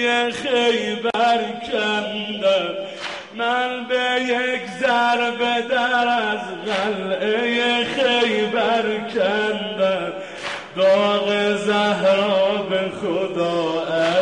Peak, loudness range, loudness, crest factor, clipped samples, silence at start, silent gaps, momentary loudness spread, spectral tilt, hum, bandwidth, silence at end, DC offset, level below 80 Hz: -6 dBFS; 2 LU; -20 LUFS; 14 dB; under 0.1%; 0 s; none; 7 LU; -4 dB/octave; none; 11 kHz; 0 s; 0.1%; -62 dBFS